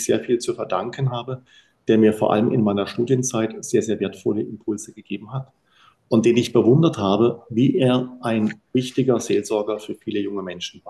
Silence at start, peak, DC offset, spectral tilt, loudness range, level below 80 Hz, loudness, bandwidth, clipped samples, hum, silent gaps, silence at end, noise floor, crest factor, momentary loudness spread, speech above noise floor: 0 s; -4 dBFS; under 0.1%; -6 dB/octave; 4 LU; -58 dBFS; -21 LUFS; 12.5 kHz; under 0.1%; none; none; 0 s; -57 dBFS; 18 dB; 13 LU; 36 dB